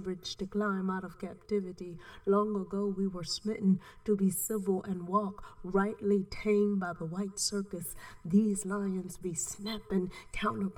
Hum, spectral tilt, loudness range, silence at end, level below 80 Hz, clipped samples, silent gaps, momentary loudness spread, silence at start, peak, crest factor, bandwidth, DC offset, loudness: none; -5.5 dB/octave; 2 LU; 0 s; -56 dBFS; under 0.1%; none; 10 LU; 0 s; -16 dBFS; 18 dB; 17.5 kHz; under 0.1%; -33 LUFS